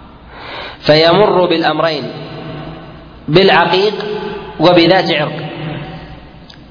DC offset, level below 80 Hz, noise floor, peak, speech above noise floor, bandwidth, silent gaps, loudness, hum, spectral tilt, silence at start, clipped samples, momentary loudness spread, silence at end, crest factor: under 0.1%; -42 dBFS; -36 dBFS; 0 dBFS; 25 dB; 5.4 kHz; none; -12 LUFS; none; -6.5 dB/octave; 0 s; under 0.1%; 20 LU; 0.25 s; 14 dB